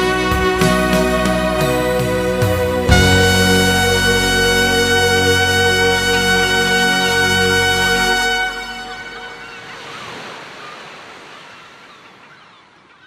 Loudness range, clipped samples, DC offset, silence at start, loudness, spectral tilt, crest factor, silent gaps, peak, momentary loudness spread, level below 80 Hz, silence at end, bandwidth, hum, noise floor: 19 LU; under 0.1%; under 0.1%; 0 s; -14 LUFS; -3.5 dB/octave; 16 dB; none; 0 dBFS; 19 LU; -30 dBFS; 1.4 s; 15.5 kHz; none; -47 dBFS